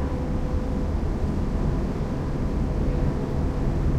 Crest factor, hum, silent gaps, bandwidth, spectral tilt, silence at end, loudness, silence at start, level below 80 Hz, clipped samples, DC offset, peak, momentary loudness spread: 12 dB; none; none; 9.2 kHz; -8.5 dB/octave; 0 s; -27 LUFS; 0 s; -28 dBFS; under 0.1%; under 0.1%; -12 dBFS; 2 LU